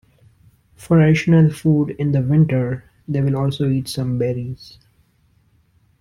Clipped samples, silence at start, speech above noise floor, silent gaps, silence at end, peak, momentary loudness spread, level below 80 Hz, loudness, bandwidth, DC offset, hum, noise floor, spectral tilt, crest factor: under 0.1%; 0.8 s; 42 dB; none; 1.35 s; -4 dBFS; 12 LU; -48 dBFS; -18 LUFS; 12.5 kHz; under 0.1%; none; -59 dBFS; -8 dB/octave; 14 dB